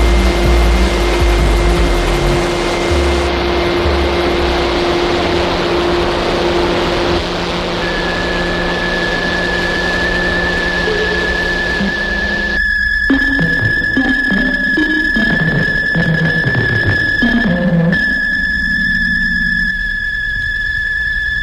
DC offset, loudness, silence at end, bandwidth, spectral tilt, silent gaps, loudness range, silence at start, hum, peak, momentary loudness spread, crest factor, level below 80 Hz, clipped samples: under 0.1%; -14 LUFS; 0 s; 14.5 kHz; -5 dB/octave; none; 3 LU; 0 s; none; 0 dBFS; 3 LU; 14 dB; -20 dBFS; under 0.1%